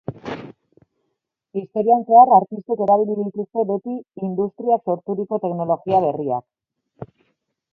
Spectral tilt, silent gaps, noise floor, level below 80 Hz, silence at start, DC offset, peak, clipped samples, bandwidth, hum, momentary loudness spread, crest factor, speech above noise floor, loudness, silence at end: -10 dB/octave; none; -76 dBFS; -64 dBFS; 0.1 s; under 0.1%; 0 dBFS; under 0.1%; 4.6 kHz; none; 19 LU; 20 dB; 58 dB; -19 LUFS; 0.7 s